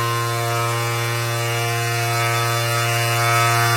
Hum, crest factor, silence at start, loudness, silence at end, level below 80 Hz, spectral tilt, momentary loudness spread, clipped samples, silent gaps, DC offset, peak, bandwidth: none; 16 dB; 0 s; -19 LUFS; 0 s; -58 dBFS; -3.5 dB/octave; 5 LU; under 0.1%; none; under 0.1%; -4 dBFS; 16 kHz